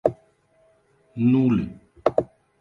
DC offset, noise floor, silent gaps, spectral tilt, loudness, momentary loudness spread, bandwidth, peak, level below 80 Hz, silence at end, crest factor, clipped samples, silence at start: under 0.1%; -61 dBFS; none; -10 dB/octave; -23 LUFS; 18 LU; 5 kHz; -2 dBFS; -54 dBFS; 0.35 s; 22 dB; under 0.1%; 0.05 s